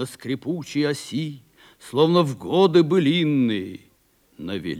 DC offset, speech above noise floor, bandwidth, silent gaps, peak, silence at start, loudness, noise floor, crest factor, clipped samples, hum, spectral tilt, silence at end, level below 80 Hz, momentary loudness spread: under 0.1%; 40 dB; 15 kHz; none; -4 dBFS; 0 s; -21 LUFS; -61 dBFS; 18 dB; under 0.1%; none; -6.5 dB/octave; 0 s; -66 dBFS; 14 LU